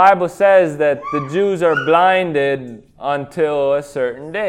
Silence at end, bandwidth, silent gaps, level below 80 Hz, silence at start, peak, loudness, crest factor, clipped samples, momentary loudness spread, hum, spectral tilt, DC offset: 0 s; 11.5 kHz; none; -56 dBFS; 0 s; 0 dBFS; -16 LUFS; 16 dB; under 0.1%; 10 LU; none; -6 dB/octave; under 0.1%